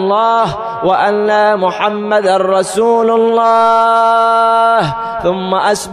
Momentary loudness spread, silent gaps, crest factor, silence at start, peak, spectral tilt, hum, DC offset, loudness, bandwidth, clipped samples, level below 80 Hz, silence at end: 7 LU; none; 10 dB; 0 s; -2 dBFS; -4.5 dB/octave; none; under 0.1%; -11 LUFS; 14 kHz; under 0.1%; -48 dBFS; 0 s